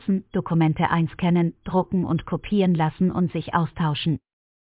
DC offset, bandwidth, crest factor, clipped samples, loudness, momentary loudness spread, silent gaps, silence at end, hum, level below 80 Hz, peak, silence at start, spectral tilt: under 0.1%; 4 kHz; 16 dB; under 0.1%; -23 LUFS; 5 LU; none; 0.5 s; none; -48 dBFS; -8 dBFS; 0.05 s; -11.5 dB/octave